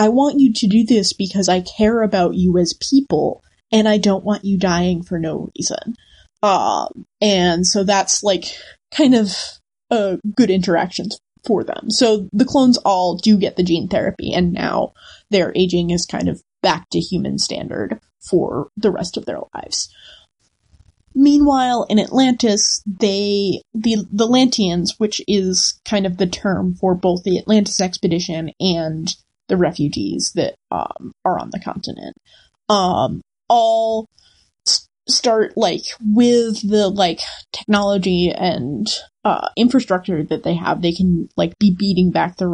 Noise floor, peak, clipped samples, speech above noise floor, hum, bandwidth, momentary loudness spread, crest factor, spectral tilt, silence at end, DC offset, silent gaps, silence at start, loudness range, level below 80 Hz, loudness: -62 dBFS; -2 dBFS; under 0.1%; 45 dB; none; 11 kHz; 11 LU; 16 dB; -4.5 dB/octave; 0 s; under 0.1%; none; 0 s; 5 LU; -46 dBFS; -17 LUFS